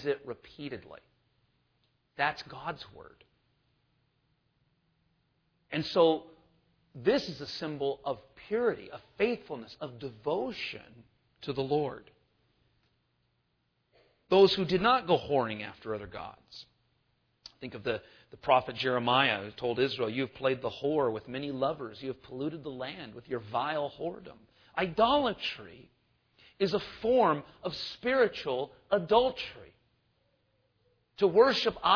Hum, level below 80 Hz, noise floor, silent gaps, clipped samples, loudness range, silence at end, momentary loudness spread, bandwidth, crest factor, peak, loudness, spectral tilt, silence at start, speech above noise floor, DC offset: none; -64 dBFS; -77 dBFS; none; under 0.1%; 10 LU; 0 s; 18 LU; 5.4 kHz; 22 dB; -10 dBFS; -30 LUFS; -6 dB/octave; 0 s; 46 dB; under 0.1%